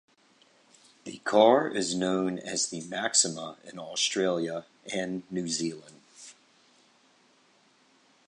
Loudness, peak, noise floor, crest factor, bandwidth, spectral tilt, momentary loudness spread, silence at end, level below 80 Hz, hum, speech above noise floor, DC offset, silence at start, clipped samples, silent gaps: -28 LUFS; -6 dBFS; -64 dBFS; 24 dB; 11.5 kHz; -3 dB/octave; 24 LU; 1.95 s; -74 dBFS; none; 36 dB; under 0.1%; 1.05 s; under 0.1%; none